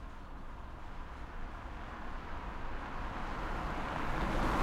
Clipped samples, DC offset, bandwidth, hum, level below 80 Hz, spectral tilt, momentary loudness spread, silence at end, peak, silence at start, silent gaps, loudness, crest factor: under 0.1%; under 0.1%; 13 kHz; none; -42 dBFS; -6 dB/octave; 13 LU; 0 s; -20 dBFS; 0 s; none; -42 LUFS; 18 dB